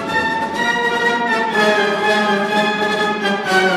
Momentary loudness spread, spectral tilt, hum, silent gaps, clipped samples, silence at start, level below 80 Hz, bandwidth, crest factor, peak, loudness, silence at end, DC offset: 3 LU; -4 dB/octave; none; none; under 0.1%; 0 s; -54 dBFS; 15 kHz; 14 dB; -4 dBFS; -16 LUFS; 0 s; under 0.1%